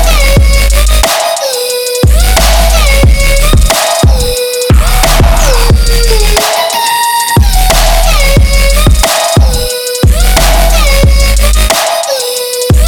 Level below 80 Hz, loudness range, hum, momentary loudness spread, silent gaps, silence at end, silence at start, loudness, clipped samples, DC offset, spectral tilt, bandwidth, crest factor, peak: -8 dBFS; 1 LU; none; 4 LU; none; 0 s; 0 s; -8 LUFS; 1%; under 0.1%; -3.5 dB/octave; over 20 kHz; 6 dB; 0 dBFS